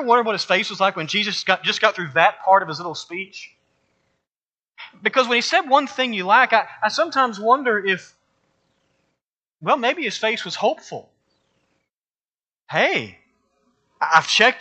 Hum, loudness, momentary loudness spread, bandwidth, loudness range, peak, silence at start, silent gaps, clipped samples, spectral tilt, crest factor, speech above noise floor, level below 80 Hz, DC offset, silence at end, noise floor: none; -19 LUFS; 14 LU; 8.8 kHz; 7 LU; 0 dBFS; 0 s; 4.37-4.50 s, 4.62-4.66 s, 9.23-9.37 s, 9.47-9.56 s, 11.93-12.02 s; under 0.1%; -3 dB/octave; 20 dB; over 70 dB; -76 dBFS; under 0.1%; 0 s; under -90 dBFS